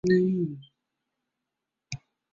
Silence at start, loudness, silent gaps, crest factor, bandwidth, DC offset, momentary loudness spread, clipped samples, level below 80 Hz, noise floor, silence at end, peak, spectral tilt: 0.05 s; -26 LUFS; none; 18 dB; 7.6 kHz; under 0.1%; 19 LU; under 0.1%; -64 dBFS; -86 dBFS; 0.35 s; -12 dBFS; -7.5 dB/octave